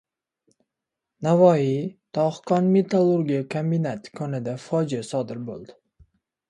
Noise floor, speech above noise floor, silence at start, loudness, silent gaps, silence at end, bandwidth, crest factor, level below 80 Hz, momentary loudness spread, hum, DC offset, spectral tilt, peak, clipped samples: -85 dBFS; 63 dB; 1.2 s; -23 LUFS; none; 0.8 s; 11 kHz; 20 dB; -66 dBFS; 13 LU; none; under 0.1%; -8 dB/octave; -4 dBFS; under 0.1%